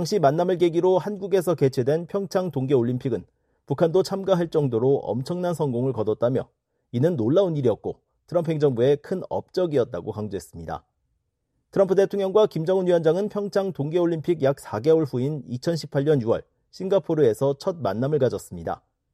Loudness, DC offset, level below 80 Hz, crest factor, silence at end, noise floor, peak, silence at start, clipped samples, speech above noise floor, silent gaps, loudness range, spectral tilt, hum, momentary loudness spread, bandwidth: -23 LUFS; under 0.1%; -60 dBFS; 16 dB; 0.4 s; -75 dBFS; -6 dBFS; 0 s; under 0.1%; 52 dB; none; 3 LU; -7.5 dB/octave; none; 11 LU; 14.5 kHz